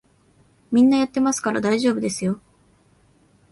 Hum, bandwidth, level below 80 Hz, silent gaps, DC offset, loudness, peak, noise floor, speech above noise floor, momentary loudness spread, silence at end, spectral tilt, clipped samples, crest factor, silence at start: none; 11.5 kHz; -60 dBFS; none; under 0.1%; -20 LUFS; -8 dBFS; -58 dBFS; 39 dB; 9 LU; 1.15 s; -5 dB/octave; under 0.1%; 14 dB; 0.7 s